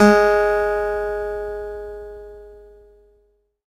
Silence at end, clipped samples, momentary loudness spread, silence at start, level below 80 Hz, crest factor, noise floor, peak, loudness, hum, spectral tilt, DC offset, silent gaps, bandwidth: 1.1 s; under 0.1%; 23 LU; 0 s; -42 dBFS; 20 dB; -62 dBFS; 0 dBFS; -20 LUFS; none; -6 dB/octave; under 0.1%; none; 15.5 kHz